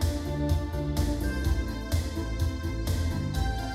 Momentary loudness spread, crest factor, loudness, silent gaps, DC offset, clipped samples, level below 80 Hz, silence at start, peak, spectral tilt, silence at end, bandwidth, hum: 2 LU; 14 dB; -30 LUFS; none; under 0.1%; under 0.1%; -32 dBFS; 0 s; -14 dBFS; -6 dB/octave; 0 s; 16 kHz; none